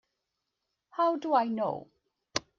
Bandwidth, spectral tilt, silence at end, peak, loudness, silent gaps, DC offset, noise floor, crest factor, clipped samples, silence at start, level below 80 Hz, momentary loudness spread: 9.2 kHz; -4 dB/octave; 0.2 s; -10 dBFS; -30 LUFS; none; under 0.1%; -84 dBFS; 22 dB; under 0.1%; 0.95 s; -74 dBFS; 13 LU